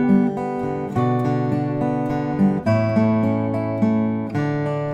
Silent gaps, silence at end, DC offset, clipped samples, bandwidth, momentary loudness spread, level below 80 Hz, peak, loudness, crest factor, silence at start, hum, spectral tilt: none; 0 s; under 0.1%; under 0.1%; 8.4 kHz; 5 LU; -50 dBFS; -6 dBFS; -21 LUFS; 14 dB; 0 s; none; -9.5 dB/octave